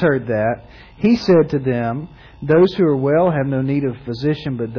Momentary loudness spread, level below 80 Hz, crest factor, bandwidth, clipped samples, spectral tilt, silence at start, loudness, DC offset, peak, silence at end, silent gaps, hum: 10 LU; -46 dBFS; 12 dB; 5.4 kHz; under 0.1%; -8.5 dB/octave; 0 s; -17 LUFS; under 0.1%; -4 dBFS; 0 s; none; none